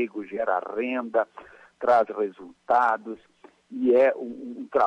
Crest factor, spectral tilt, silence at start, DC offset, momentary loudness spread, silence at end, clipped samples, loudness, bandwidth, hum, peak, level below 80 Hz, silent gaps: 16 dB; -6 dB/octave; 0 s; under 0.1%; 17 LU; 0 s; under 0.1%; -25 LUFS; 8.4 kHz; none; -10 dBFS; -72 dBFS; none